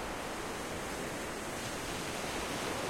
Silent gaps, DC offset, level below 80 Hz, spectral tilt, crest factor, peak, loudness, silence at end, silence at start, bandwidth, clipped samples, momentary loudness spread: none; under 0.1%; -54 dBFS; -3 dB/octave; 14 dB; -24 dBFS; -38 LUFS; 0 s; 0 s; 16.5 kHz; under 0.1%; 3 LU